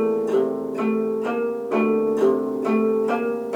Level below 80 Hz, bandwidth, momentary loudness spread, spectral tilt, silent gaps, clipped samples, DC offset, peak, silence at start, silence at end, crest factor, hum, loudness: -64 dBFS; 12 kHz; 4 LU; -7.5 dB/octave; none; under 0.1%; under 0.1%; -8 dBFS; 0 s; 0 s; 14 dB; none; -22 LUFS